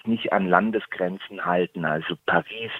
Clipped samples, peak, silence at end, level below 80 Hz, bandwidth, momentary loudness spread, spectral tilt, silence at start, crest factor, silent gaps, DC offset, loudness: under 0.1%; -2 dBFS; 0 s; -64 dBFS; 4.2 kHz; 8 LU; -8 dB/octave; 0.05 s; 24 dB; none; under 0.1%; -24 LUFS